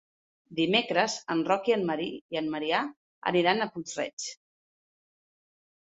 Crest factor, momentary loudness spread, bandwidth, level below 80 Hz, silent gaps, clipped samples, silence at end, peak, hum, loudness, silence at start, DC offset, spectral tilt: 22 dB; 10 LU; 8.4 kHz; -74 dBFS; 2.21-2.29 s, 2.96-3.22 s, 4.13-4.17 s; under 0.1%; 1.6 s; -8 dBFS; none; -28 LUFS; 0.5 s; under 0.1%; -4 dB/octave